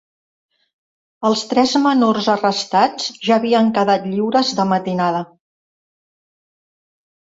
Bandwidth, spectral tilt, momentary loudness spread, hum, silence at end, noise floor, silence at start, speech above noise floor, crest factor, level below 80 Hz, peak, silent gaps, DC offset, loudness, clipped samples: 8 kHz; -5 dB/octave; 6 LU; none; 2.05 s; under -90 dBFS; 1.2 s; over 74 dB; 18 dB; -64 dBFS; -2 dBFS; none; under 0.1%; -17 LUFS; under 0.1%